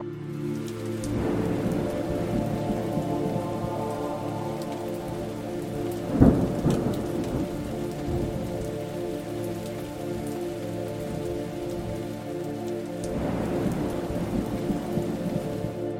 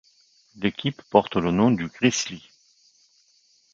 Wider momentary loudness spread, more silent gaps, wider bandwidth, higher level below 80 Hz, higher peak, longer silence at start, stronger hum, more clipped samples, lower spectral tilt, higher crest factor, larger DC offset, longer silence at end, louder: second, 6 LU vs 9 LU; neither; first, 16.5 kHz vs 7.6 kHz; first, -42 dBFS vs -56 dBFS; about the same, -2 dBFS vs -2 dBFS; second, 0 s vs 0.55 s; neither; neither; first, -7.5 dB/octave vs -5 dB/octave; about the same, 26 dB vs 24 dB; neither; second, 0 s vs 1.35 s; second, -29 LUFS vs -23 LUFS